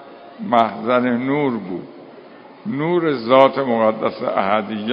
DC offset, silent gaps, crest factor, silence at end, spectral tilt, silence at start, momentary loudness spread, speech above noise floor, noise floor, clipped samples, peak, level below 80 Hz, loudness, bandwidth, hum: under 0.1%; none; 18 dB; 0 s; -8.5 dB/octave; 0 s; 17 LU; 24 dB; -41 dBFS; under 0.1%; 0 dBFS; -64 dBFS; -18 LUFS; 5.4 kHz; none